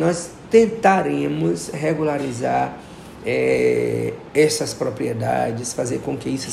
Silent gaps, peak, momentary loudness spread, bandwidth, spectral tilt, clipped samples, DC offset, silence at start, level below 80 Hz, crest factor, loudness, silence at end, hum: none; -2 dBFS; 9 LU; 14 kHz; -5 dB/octave; under 0.1%; under 0.1%; 0 s; -52 dBFS; 18 dB; -20 LUFS; 0 s; none